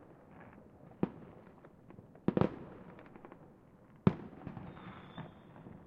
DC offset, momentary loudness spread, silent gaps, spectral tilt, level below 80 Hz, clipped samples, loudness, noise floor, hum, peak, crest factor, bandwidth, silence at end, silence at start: under 0.1%; 24 LU; none; -10 dB/octave; -66 dBFS; under 0.1%; -39 LUFS; -60 dBFS; none; -12 dBFS; 30 dB; 5.6 kHz; 0 s; 0 s